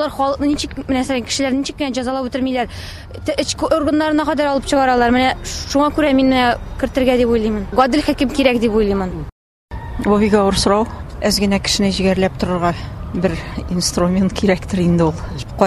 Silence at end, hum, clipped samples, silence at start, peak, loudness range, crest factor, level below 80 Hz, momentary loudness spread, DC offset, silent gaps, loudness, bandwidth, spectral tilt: 0 s; none; under 0.1%; 0 s; 0 dBFS; 3 LU; 16 dB; -32 dBFS; 11 LU; under 0.1%; 9.32-9.68 s; -17 LUFS; 14 kHz; -5 dB/octave